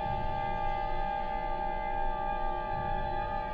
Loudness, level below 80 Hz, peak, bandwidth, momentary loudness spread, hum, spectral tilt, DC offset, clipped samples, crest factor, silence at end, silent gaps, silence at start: -34 LUFS; -38 dBFS; -20 dBFS; 5 kHz; 1 LU; none; -8 dB/octave; under 0.1%; under 0.1%; 12 dB; 0 s; none; 0 s